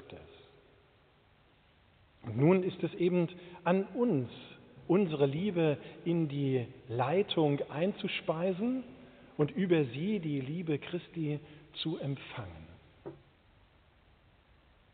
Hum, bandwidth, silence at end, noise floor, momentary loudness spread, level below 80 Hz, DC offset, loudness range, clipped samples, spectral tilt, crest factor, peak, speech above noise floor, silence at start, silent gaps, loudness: none; 4.6 kHz; 1.8 s; -65 dBFS; 19 LU; -68 dBFS; under 0.1%; 9 LU; under 0.1%; -6 dB/octave; 20 dB; -14 dBFS; 33 dB; 0 s; none; -33 LUFS